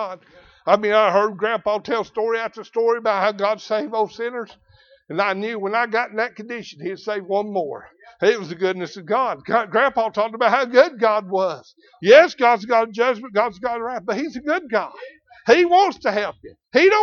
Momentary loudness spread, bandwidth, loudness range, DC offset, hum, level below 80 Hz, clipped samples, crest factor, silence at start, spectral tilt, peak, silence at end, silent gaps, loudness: 14 LU; 7 kHz; 7 LU; under 0.1%; none; -64 dBFS; under 0.1%; 18 dB; 0 s; -4.5 dB/octave; -2 dBFS; 0 s; none; -20 LUFS